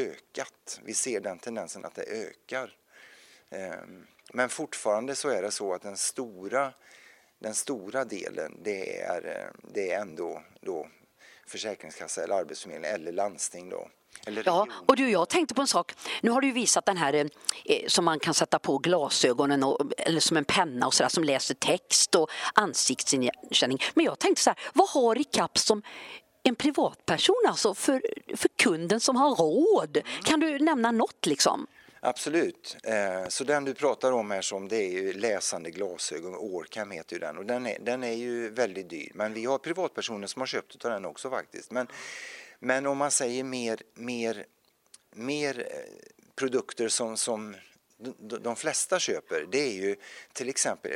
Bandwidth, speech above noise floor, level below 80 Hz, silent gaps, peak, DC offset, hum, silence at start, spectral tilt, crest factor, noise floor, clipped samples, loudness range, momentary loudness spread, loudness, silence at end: 16 kHz; 31 dB; -74 dBFS; none; -6 dBFS; under 0.1%; none; 0 s; -2.5 dB/octave; 22 dB; -60 dBFS; under 0.1%; 10 LU; 15 LU; -28 LUFS; 0 s